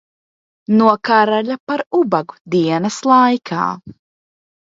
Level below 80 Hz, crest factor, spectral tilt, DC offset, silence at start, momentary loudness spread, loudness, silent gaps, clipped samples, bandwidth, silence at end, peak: -64 dBFS; 16 dB; -5.5 dB/octave; under 0.1%; 0.7 s; 9 LU; -16 LUFS; 1.60-1.67 s, 2.41-2.45 s; under 0.1%; 7.8 kHz; 0.75 s; 0 dBFS